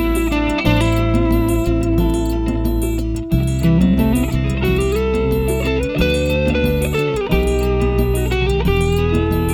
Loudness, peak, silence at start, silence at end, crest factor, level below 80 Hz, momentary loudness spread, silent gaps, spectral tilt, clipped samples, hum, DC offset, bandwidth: -17 LUFS; -2 dBFS; 0 s; 0 s; 14 dB; -22 dBFS; 4 LU; none; -6.5 dB/octave; under 0.1%; none; 0.1%; 17.5 kHz